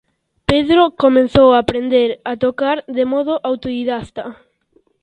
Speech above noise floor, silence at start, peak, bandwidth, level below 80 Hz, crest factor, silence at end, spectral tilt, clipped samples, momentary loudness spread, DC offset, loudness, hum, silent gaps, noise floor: 44 dB; 0.5 s; 0 dBFS; 9.2 kHz; -42 dBFS; 16 dB; 0.7 s; -7 dB/octave; under 0.1%; 13 LU; under 0.1%; -15 LUFS; none; none; -58 dBFS